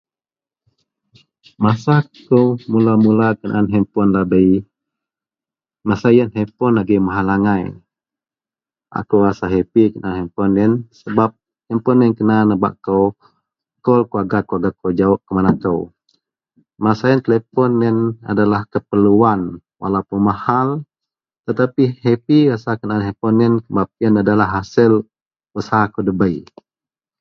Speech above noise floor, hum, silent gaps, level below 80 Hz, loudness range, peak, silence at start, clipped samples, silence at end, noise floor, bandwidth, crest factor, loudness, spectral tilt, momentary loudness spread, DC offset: over 75 dB; none; 25.22-25.31 s; -46 dBFS; 3 LU; 0 dBFS; 1.6 s; under 0.1%; 0.8 s; under -90 dBFS; 6.6 kHz; 16 dB; -16 LUFS; -9 dB/octave; 8 LU; under 0.1%